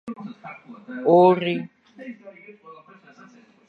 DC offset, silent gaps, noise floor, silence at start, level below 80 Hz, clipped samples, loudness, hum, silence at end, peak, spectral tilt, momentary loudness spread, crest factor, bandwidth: under 0.1%; none; -51 dBFS; 0.05 s; -78 dBFS; under 0.1%; -19 LUFS; none; 0.95 s; -4 dBFS; -8.5 dB/octave; 26 LU; 20 dB; 4.8 kHz